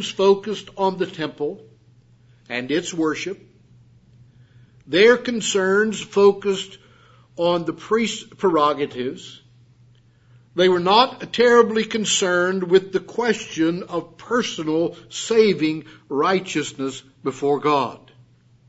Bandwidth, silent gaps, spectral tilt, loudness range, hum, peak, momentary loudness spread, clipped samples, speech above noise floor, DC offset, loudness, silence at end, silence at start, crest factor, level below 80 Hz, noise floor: 8 kHz; none; -4 dB/octave; 8 LU; none; -2 dBFS; 14 LU; under 0.1%; 33 dB; under 0.1%; -20 LUFS; 0.7 s; 0 s; 20 dB; -64 dBFS; -54 dBFS